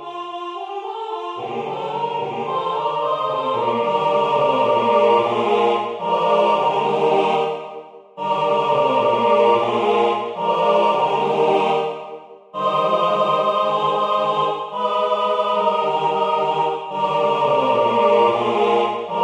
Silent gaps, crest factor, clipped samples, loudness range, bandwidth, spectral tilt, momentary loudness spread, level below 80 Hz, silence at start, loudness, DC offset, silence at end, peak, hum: none; 14 dB; under 0.1%; 3 LU; 9.6 kHz; -5.5 dB/octave; 11 LU; -66 dBFS; 0 s; -19 LUFS; under 0.1%; 0 s; -4 dBFS; none